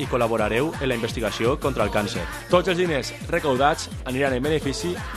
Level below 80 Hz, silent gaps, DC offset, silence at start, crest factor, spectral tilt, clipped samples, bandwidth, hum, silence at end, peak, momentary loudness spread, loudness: -38 dBFS; none; under 0.1%; 0 s; 18 dB; -5 dB/octave; under 0.1%; 15 kHz; none; 0 s; -6 dBFS; 7 LU; -23 LUFS